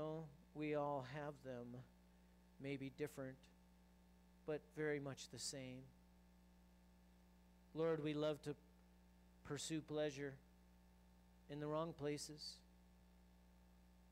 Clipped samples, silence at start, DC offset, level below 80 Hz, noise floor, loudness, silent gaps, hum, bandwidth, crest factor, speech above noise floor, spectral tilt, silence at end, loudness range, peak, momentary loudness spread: under 0.1%; 0 s; under 0.1%; -72 dBFS; -70 dBFS; -48 LUFS; none; none; 15.5 kHz; 20 dB; 22 dB; -5 dB/octave; 0 s; 5 LU; -32 dBFS; 14 LU